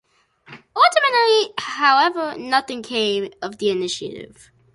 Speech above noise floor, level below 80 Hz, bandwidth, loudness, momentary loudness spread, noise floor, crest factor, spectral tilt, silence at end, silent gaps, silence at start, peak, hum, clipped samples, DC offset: 30 dB; -64 dBFS; 11.5 kHz; -19 LUFS; 14 LU; -51 dBFS; 18 dB; -2.5 dB/octave; 0.5 s; none; 0.5 s; -2 dBFS; none; under 0.1%; under 0.1%